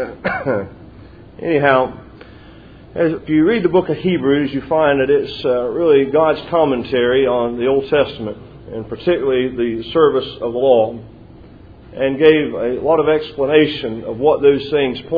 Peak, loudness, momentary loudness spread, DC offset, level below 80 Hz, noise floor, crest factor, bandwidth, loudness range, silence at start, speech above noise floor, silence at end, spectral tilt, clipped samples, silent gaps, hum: 0 dBFS; -16 LUFS; 10 LU; under 0.1%; -46 dBFS; -40 dBFS; 16 dB; 5 kHz; 3 LU; 0 s; 24 dB; 0 s; -9 dB/octave; under 0.1%; none; none